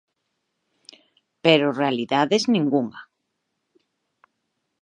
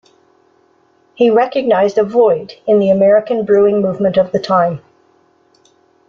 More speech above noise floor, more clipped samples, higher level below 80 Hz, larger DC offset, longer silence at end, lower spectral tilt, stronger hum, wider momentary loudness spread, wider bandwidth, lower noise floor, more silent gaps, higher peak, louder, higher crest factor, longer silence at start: first, 57 dB vs 42 dB; neither; second, -76 dBFS vs -56 dBFS; neither; first, 1.8 s vs 1.3 s; second, -5 dB/octave vs -7.5 dB/octave; neither; about the same, 6 LU vs 4 LU; first, 10 kHz vs 7 kHz; first, -77 dBFS vs -54 dBFS; neither; about the same, -2 dBFS vs -2 dBFS; second, -21 LUFS vs -13 LUFS; first, 24 dB vs 12 dB; first, 1.45 s vs 1.2 s